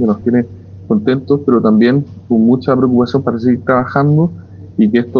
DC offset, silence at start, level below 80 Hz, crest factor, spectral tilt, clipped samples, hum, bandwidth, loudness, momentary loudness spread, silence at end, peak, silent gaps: under 0.1%; 0 s; -50 dBFS; 12 dB; -10 dB/octave; under 0.1%; none; 5.4 kHz; -13 LUFS; 6 LU; 0 s; 0 dBFS; none